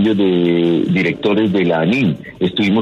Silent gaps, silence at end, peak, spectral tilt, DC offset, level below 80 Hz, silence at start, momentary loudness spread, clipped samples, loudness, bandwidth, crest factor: none; 0 s; -2 dBFS; -8 dB/octave; under 0.1%; -52 dBFS; 0 s; 4 LU; under 0.1%; -15 LUFS; 7.8 kHz; 12 dB